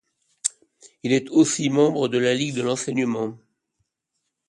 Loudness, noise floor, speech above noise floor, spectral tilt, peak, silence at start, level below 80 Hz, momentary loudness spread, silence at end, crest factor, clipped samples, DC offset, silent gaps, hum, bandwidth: -22 LUFS; -79 dBFS; 57 dB; -4.5 dB/octave; -4 dBFS; 0.45 s; -68 dBFS; 9 LU; 1.15 s; 20 dB; under 0.1%; under 0.1%; none; none; 11.5 kHz